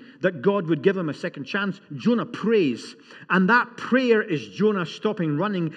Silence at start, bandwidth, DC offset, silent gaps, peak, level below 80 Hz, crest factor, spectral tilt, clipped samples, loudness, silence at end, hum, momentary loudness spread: 0.1 s; 9.2 kHz; under 0.1%; none; -6 dBFS; -84 dBFS; 18 dB; -7 dB/octave; under 0.1%; -23 LUFS; 0 s; none; 9 LU